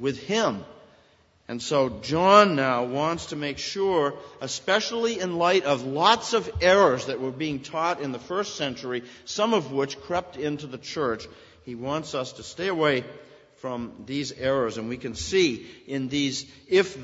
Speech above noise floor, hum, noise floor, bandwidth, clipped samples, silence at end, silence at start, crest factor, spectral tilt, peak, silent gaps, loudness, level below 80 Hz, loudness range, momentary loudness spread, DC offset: 35 dB; none; -60 dBFS; 8 kHz; under 0.1%; 0 s; 0 s; 24 dB; -4 dB/octave; -2 dBFS; none; -25 LUFS; -54 dBFS; 7 LU; 14 LU; under 0.1%